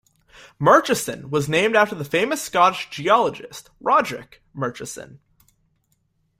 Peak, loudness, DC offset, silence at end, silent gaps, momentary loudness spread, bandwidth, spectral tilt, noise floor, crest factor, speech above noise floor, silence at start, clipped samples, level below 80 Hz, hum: -2 dBFS; -20 LUFS; under 0.1%; 1.25 s; none; 19 LU; 16 kHz; -4 dB/octave; -68 dBFS; 20 dB; 47 dB; 0.6 s; under 0.1%; -60 dBFS; none